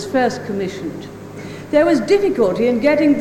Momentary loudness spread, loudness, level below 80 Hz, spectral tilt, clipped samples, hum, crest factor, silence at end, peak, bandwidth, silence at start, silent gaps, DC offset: 18 LU; -16 LUFS; -50 dBFS; -6 dB/octave; under 0.1%; none; 14 dB; 0 s; -4 dBFS; 16.5 kHz; 0 s; none; under 0.1%